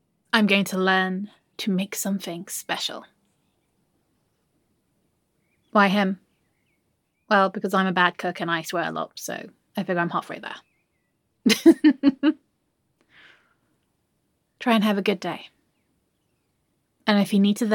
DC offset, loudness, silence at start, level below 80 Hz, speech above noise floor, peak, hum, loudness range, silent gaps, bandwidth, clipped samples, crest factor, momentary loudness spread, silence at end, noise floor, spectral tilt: under 0.1%; -23 LUFS; 0.35 s; -74 dBFS; 50 dB; -2 dBFS; none; 8 LU; none; 17.5 kHz; under 0.1%; 22 dB; 16 LU; 0 s; -72 dBFS; -4.5 dB/octave